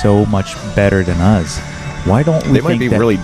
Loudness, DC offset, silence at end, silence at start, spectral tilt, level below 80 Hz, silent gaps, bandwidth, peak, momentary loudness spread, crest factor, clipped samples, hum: -14 LUFS; under 0.1%; 0 s; 0 s; -7 dB/octave; -30 dBFS; none; 13.5 kHz; 0 dBFS; 9 LU; 12 dB; under 0.1%; none